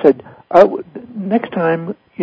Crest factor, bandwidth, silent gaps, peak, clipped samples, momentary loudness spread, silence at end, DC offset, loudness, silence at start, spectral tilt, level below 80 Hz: 16 dB; 8 kHz; none; 0 dBFS; 0.6%; 16 LU; 0 s; under 0.1%; -15 LUFS; 0 s; -8.5 dB/octave; -58 dBFS